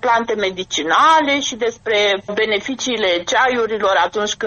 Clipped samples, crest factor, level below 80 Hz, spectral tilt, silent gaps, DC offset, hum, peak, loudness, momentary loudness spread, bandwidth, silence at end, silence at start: under 0.1%; 16 dB; -54 dBFS; -2 dB/octave; none; under 0.1%; none; -2 dBFS; -16 LUFS; 8 LU; 8.4 kHz; 0 s; 0.05 s